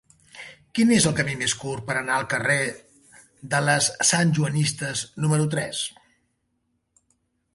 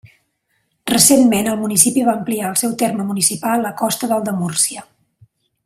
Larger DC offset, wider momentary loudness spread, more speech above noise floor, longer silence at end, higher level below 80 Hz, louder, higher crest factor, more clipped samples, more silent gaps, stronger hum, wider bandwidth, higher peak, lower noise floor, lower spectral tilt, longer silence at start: neither; first, 12 LU vs 9 LU; about the same, 50 dB vs 51 dB; first, 1.65 s vs 0.8 s; about the same, -58 dBFS vs -56 dBFS; second, -23 LUFS vs -15 LUFS; about the same, 20 dB vs 18 dB; neither; neither; neither; second, 11.5 kHz vs 16 kHz; second, -6 dBFS vs 0 dBFS; first, -73 dBFS vs -67 dBFS; about the same, -3.5 dB/octave vs -3 dB/octave; second, 0.35 s vs 0.85 s